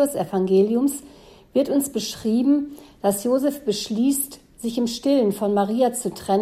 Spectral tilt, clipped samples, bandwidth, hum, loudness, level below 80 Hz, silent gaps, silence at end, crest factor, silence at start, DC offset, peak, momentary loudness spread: -5 dB/octave; under 0.1%; 16 kHz; none; -22 LUFS; -56 dBFS; none; 0 s; 14 dB; 0 s; under 0.1%; -8 dBFS; 7 LU